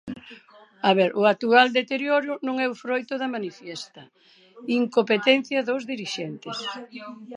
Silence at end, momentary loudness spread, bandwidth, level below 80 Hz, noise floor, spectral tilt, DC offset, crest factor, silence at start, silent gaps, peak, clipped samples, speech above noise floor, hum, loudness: 0 s; 19 LU; 11 kHz; -74 dBFS; -51 dBFS; -4.5 dB/octave; under 0.1%; 22 dB; 0.05 s; none; -2 dBFS; under 0.1%; 27 dB; none; -23 LUFS